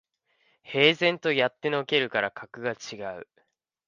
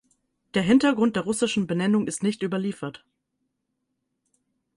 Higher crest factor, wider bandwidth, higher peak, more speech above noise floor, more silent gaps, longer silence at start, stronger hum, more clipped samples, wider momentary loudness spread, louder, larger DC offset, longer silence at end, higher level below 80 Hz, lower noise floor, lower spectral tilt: first, 24 dB vs 18 dB; second, 7.4 kHz vs 11.5 kHz; first, -4 dBFS vs -8 dBFS; second, 44 dB vs 55 dB; neither; about the same, 0.65 s vs 0.55 s; neither; neither; first, 16 LU vs 10 LU; about the same, -25 LUFS vs -24 LUFS; neither; second, 0.65 s vs 1.85 s; second, -74 dBFS vs -62 dBFS; second, -70 dBFS vs -78 dBFS; about the same, -4.5 dB/octave vs -5 dB/octave